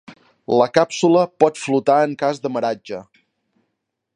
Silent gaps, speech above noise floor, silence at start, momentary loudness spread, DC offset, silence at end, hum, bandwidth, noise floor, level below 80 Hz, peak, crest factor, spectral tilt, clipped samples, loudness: none; 59 dB; 0.1 s; 14 LU; under 0.1%; 1.15 s; none; 10.5 kHz; -76 dBFS; -66 dBFS; 0 dBFS; 20 dB; -5.5 dB/octave; under 0.1%; -18 LUFS